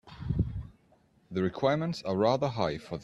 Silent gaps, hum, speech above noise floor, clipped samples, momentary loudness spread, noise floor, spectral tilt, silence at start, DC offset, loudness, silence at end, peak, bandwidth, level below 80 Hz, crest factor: none; none; 36 dB; under 0.1%; 10 LU; -65 dBFS; -7 dB/octave; 0.05 s; under 0.1%; -30 LUFS; 0 s; -12 dBFS; 11 kHz; -48 dBFS; 18 dB